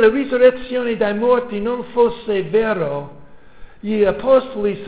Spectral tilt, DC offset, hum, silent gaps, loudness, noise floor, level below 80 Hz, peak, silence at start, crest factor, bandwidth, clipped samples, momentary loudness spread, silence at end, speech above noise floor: -10 dB/octave; 1%; none; none; -18 LUFS; -40 dBFS; -48 dBFS; -2 dBFS; 0 s; 16 dB; 4 kHz; under 0.1%; 10 LU; 0 s; 23 dB